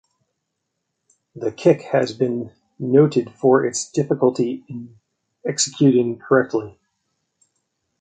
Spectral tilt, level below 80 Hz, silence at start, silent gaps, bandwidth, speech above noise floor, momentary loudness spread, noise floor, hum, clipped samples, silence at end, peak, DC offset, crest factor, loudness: -5.5 dB/octave; -64 dBFS; 1.35 s; none; 9.6 kHz; 58 dB; 15 LU; -77 dBFS; none; under 0.1%; 1.3 s; -2 dBFS; under 0.1%; 20 dB; -19 LUFS